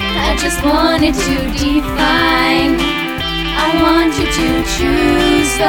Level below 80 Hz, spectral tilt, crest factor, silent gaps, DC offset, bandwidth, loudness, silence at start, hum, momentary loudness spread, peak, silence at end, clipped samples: -24 dBFS; -4 dB/octave; 12 dB; none; under 0.1%; 19 kHz; -13 LUFS; 0 s; none; 5 LU; 0 dBFS; 0 s; under 0.1%